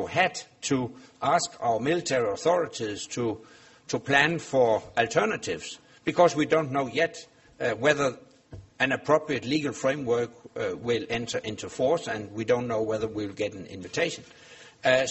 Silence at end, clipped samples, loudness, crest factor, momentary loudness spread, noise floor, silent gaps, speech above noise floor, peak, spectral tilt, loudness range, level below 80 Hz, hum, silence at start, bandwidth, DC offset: 0 s; under 0.1%; -27 LUFS; 22 dB; 10 LU; -48 dBFS; none; 21 dB; -6 dBFS; -4 dB/octave; 4 LU; -62 dBFS; none; 0 s; 8.2 kHz; under 0.1%